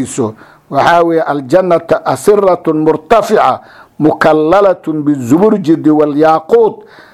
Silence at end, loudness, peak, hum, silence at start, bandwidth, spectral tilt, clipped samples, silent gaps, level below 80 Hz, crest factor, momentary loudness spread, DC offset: 0.35 s; -10 LUFS; 0 dBFS; none; 0 s; 14 kHz; -6 dB/octave; 0.4%; none; -46 dBFS; 10 dB; 6 LU; under 0.1%